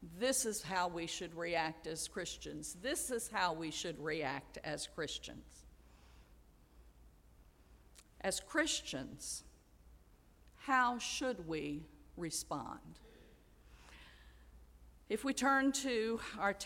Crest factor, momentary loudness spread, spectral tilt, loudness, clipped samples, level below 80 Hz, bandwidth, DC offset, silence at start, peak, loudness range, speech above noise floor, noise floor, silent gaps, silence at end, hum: 22 dB; 17 LU; -2.5 dB/octave; -38 LUFS; under 0.1%; -62 dBFS; 16.5 kHz; under 0.1%; 0 s; -20 dBFS; 10 LU; 26 dB; -65 dBFS; none; 0 s; none